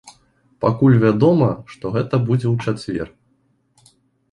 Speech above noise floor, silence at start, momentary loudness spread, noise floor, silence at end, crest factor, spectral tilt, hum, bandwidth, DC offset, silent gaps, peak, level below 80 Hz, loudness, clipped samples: 46 dB; 0.05 s; 13 LU; -63 dBFS; 1.25 s; 16 dB; -9 dB/octave; none; 11 kHz; under 0.1%; none; -2 dBFS; -50 dBFS; -18 LUFS; under 0.1%